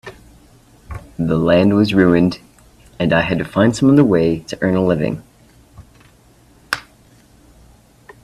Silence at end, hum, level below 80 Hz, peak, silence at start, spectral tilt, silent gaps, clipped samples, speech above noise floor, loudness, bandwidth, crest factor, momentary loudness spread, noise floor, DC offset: 1.45 s; none; -44 dBFS; 0 dBFS; 0.05 s; -7 dB/octave; none; under 0.1%; 35 dB; -16 LUFS; 13.5 kHz; 18 dB; 19 LU; -49 dBFS; under 0.1%